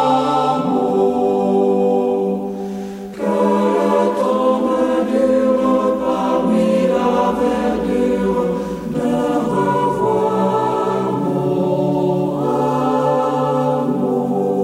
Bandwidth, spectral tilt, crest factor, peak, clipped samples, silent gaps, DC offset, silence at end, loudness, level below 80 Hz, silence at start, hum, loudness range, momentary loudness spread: 15.5 kHz; -7.5 dB/octave; 12 dB; -4 dBFS; under 0.1%; none; under 0.1%; 0 s; -17 LUFS; -48 dBFS; 0 s; none; 2 LU; 4 LU